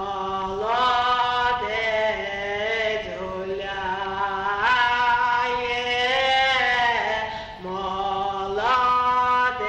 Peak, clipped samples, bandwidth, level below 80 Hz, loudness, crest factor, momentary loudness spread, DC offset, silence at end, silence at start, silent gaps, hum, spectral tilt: -10 dBFS; under 0.1%; 8.8 kHz; -48 dBFS; -22 LUFS; 14 dB; 9 LU; under 0.1%; 0 s; 0 s; none; none; -3 dB/octave